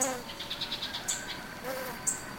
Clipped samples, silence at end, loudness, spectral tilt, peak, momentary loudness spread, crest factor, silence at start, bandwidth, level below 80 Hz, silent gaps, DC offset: under 0.1%; 0 s; -34 LUFS; -1 dB/octave; -14 dBFS; 6 LU; 22 dB; 0 s; 17 kHz; -58 dBFS; none; under 0.1%